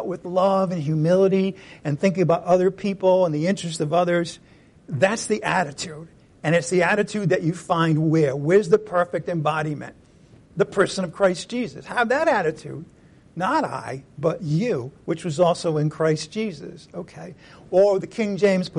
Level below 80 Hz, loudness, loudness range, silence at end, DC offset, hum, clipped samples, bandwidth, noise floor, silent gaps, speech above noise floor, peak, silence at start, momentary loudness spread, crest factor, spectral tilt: -60 dBFS; -22 LUFS; 4 LU; 0 s; under 0.1%; none; under 0.1%; 11.5 kHz; -51 dBFS; none; 29 dB; -6 dBFS; 0 s; 14 LU; 16 dB; -6 dB/octave